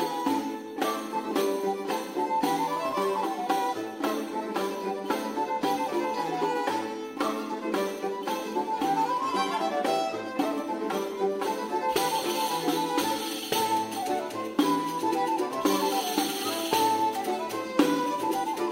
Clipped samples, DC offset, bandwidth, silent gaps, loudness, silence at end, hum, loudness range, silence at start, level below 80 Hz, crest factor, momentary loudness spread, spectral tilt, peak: under 0.1%; under 0.1%; 16 kHz; none; -28 LUFS; 0 s; none; 3 LU; 0 s; -70 dBFS; 22 dB; 5 LU; -3.5 dB/octave; -8 dBFS